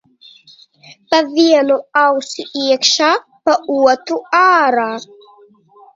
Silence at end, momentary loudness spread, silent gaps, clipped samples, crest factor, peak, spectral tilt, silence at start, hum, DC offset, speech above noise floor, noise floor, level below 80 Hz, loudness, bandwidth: 0.9 s; 9 LU; none; under 0.1%; 16 dB; 0 dBFS; -1.5 dB/octave; 1.1 s; none; under 0.1%; 33 dB; -47 dBFS; -66 dBFS; -14 LUFS; 7.8 kHz